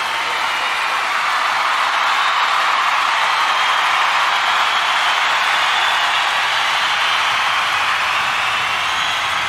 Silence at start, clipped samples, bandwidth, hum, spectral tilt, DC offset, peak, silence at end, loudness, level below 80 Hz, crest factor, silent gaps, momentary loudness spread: 0 s; under 0.1%; 16 kHz; none; 0.5 dB/octave; under 0.1%; -4 dBFS; 0 s; -15 LUFS; -58 dBFS; 14 dB; none; 3 LU